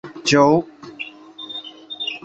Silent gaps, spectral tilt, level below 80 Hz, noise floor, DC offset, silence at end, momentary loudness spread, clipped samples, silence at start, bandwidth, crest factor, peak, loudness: none; -4.5 dB/octave; -60 dBFS; -37 dBFS; under 0.1%; 0.05 s; 20 LU; under 0.1%; 0.05 s; 8.2 kHz; 18 dB; -2 dBFS; -17 LUFS